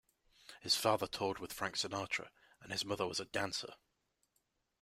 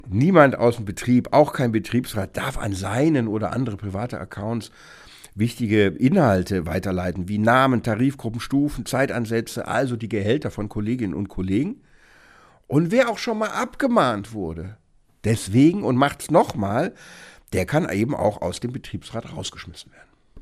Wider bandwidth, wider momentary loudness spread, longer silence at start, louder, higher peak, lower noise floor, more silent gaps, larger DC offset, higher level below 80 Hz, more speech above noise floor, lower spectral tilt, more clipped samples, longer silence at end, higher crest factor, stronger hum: about the same, 16 kHz vs 15.5 kHz; about the same, 15 LU vs 13 LU; first, 0.5 s vs 0.05 s; second, -38 LUFS vs -22 LUFS; second, -18 dBFS vs 0 dBFS; first, -82 dBFS vs -52 dBFS; neither; neither; second, -72 dBFS vs -46 dBFS; first, 43 dB vs 31 dB; second, -2.5 dB/octave vs -6.5 dB/octave; neither; first, 1.05 s vs 0 s; about the same, 24 dB vs 22 dB; neither